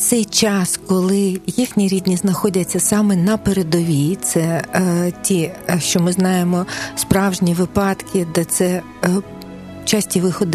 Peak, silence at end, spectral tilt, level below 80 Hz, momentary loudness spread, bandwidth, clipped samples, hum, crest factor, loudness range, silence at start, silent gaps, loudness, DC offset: 0 dBFS; 0 s; -4.5 dB/octave; -46 dBFS; 5 LU; 14.5 kHz; under 0.1%; none; 18 dB; 2 LU; 0 s; none; -17 LUFS; under 0.1%